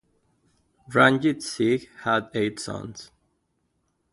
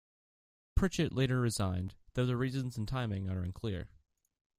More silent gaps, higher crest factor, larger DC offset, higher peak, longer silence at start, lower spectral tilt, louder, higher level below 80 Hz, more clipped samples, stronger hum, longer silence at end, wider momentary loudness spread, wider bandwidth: neither; about the same, 24 dB vs 20 dB; neither; first, -2 dBFS vs -16 dBFS; first, 0.9 s vs 0.75 s; about the same, -5 dB/octave vs -6 dB/octave; first, -23 LUFS vs -35 LUFS; second, -62 dBFS vs -46 dBFS; neither; neither; first, 1.1 s vs 0.7 s; first, 16 LU vs 9 LU; second, 11.5 kHz vs 15.5 kHz